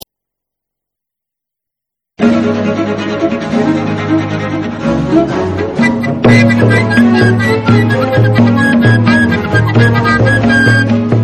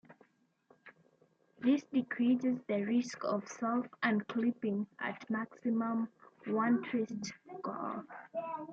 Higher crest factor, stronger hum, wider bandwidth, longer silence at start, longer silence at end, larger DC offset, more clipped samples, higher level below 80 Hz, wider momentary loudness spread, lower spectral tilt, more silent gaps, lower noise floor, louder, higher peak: second, 10 dB vs 18 dB; neither; first, 10.5 kHz vs 7.6 kHz; first, 2.2 s vs 0.1 s; about the same, 0 s vs 0 s; neither; first, 0.3% vs under 0.1%; first, -36 dBFS vs -84 dBFS; second, 7 LU vs 11 LU; about the same, -7 dB/octave vs -6 dB/octave; neither; first, -81 dBFS vs -71 dBFS; first, -10 LUFS vs -35 LUFS; first, 0 dBFS vs -18 dBFS